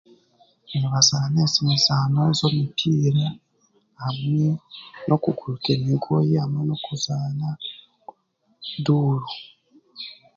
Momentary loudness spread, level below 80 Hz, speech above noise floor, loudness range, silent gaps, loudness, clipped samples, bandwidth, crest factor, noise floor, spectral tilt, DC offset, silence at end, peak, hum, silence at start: 17 LU; -58 dBFS; 44 dB; 7 LU; none; -22 LUFS; under 0.1%; 7.8 kHz; 20 dB; -66 dBFS; -5 dB/octave; under 0.1%; 0.2 s; -2 dBFS; none; 0.7 s